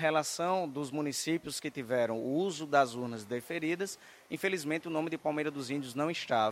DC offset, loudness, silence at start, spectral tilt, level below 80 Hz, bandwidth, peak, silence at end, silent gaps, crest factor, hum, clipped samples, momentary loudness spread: under 0.1%; -34 LUFS; 0 s; -4 dB/octave; -76 dBFS; 16 kHz; -12 dBFS; 0 s; none; 20 dB; none; under 0.1%; 8 LU